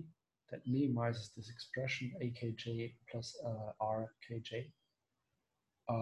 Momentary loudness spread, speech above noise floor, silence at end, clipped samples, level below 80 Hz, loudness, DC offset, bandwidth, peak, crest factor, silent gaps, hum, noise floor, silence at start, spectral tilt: 14 LU; 46 dB; 0 s; under 0.1%; -72 dBFS; -42 LUFS; under 0.1%; 11 kHz; -24 dBFS; 18 dB; none; none; -87 dBFS; 0 s; -6.5 dB/octave